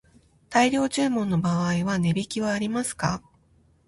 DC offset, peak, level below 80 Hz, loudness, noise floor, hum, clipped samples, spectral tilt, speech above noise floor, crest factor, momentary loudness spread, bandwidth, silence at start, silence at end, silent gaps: under 0.1%; -8 dBFS; -54 dBFS; -25 LUFS; -61 dBFS; none; under 0.1%; -5.5 dB/octave; 37 dB; 18 dB; 6 LU; 11.5 kHz; 0.5 s; 0.7 s; none